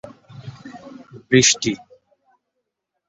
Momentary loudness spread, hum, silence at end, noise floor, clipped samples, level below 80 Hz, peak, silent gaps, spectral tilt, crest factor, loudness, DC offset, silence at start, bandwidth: 26 LU; none; 1.35 s; -78 dBFS; under 0.1%; -56 dBFS; -2 dBFS; none; -3 dB/octave; 22 dB; -16 LUFS; under 0.1%; 0.45 s; 8.4 kHz